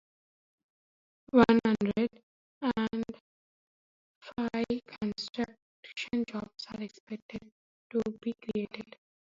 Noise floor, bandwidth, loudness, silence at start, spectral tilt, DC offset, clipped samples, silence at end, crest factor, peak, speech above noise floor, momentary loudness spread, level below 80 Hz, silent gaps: under -90 dBFS; 7.6 kHz; -32 LUFS; 1.35 s; -6.5 dB/octave; under 0.1%; under 0.1%; 0.55 s; 26 dB; -8 dBFS; over 59 dB; 18 LU; -64 dBFS; 2.23-2.61 s, 3.20-4.21 s, 5.62-5.83 s, 7.00-7.07 s, 7.22-7.29 s, 7.52-7.90 s